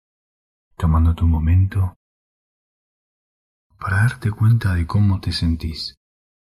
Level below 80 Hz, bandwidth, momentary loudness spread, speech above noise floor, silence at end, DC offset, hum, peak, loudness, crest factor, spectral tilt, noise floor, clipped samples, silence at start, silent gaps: -30 dBFS; 11.5 kHz; 9 LU; over 73 dB; 0.6 s; under 0.1%; none; -6 dBFS; -19 LUFS; 14 dB; -7 dB/octave; under -90 dBFS; under 0.1%; 0.8 s; 1.96-3.70 s